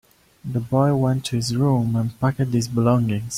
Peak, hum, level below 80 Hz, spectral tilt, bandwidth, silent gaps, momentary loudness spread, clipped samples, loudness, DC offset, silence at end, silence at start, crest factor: -6 dBFS; none; -50 dBFS; -6.5 dB/octave; 15.5 kHz; none; 5 LU; under 0.1%; -21 LUFS; under 0.1%; 0 s; 0.45 s; 16 dB